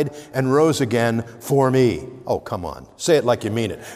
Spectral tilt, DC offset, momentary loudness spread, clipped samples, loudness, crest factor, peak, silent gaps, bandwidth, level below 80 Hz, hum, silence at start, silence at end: -6 dB/octave; under 0.1%; 11 LU; under 0.1%; -20 LUFS; 16 dB; -4 dBFS; none; 16 kHz; -52 dBFS; none; 0 s; 0 s